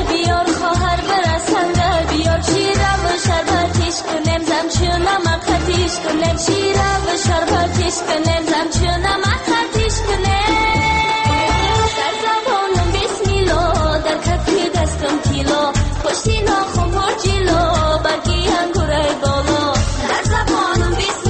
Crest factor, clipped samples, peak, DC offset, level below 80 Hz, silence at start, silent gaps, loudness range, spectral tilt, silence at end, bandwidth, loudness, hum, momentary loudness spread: 12 dB; under 0.1%; -4 dBFS; under 0.1%; -24 dBFS; 0 s; none; 1 LU; -4.5 dB/octave; 0 s; 8.8 kHz; -16 LUFS; none; 3 LU